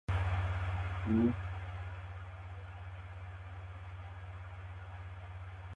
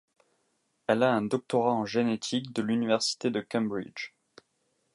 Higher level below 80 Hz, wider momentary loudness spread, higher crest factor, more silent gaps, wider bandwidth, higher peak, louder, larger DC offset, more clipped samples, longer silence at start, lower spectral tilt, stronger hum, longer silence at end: first, -46 dBFS vs -74 dBFS; first, 15 LU vs 12 LU; about the same, 18 dB vs 20 dB; neither; second, 7.4 kHz vs 11.5 kHz; second, -20 dBFS vs -10 dBFS; second, -40 LUFS vs -29 LUFS; neither; neither; second, 0.1 s vs 0.9 s; first, -8.5 dB/octave vs -4.5 dB/octave; neither; second, 0 s vs 0.9 s